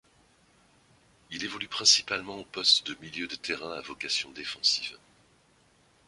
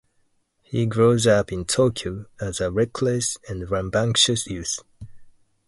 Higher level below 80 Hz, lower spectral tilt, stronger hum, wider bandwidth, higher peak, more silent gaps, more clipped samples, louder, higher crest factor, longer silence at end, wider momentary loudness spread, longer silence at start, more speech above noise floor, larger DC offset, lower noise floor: second, -68 dBFS vs -46 dBFS; second, 0 dB/octave vs -4 dB/octave; neither; about the same, 11.5 kHz vs 11.5 kHz; second, -8 dBFS vs -4 dBFS; neither; neither; second, -27 LUFS vs -22 LUFS; about the same, 24 dB vs 20 dB; first, 1.1 s vs 0.4 s; first, 16 LU vs 13 LU; first, 1.3 s vs 0.7 s; second, 34 dB vs 44 dB; neither; about the same, -64 dBFS vs -66 dBFS